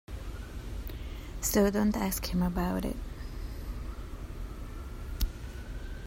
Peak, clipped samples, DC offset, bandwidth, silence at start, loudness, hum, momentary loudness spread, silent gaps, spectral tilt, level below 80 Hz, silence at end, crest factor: -12 dBFS; under 0.1%; under 0.1%; 16 kHz; 0.1 s; -34 LUFS; none; 16 LU; none; -5 dB/octave; -38 dBFS; 0 s; 20 dB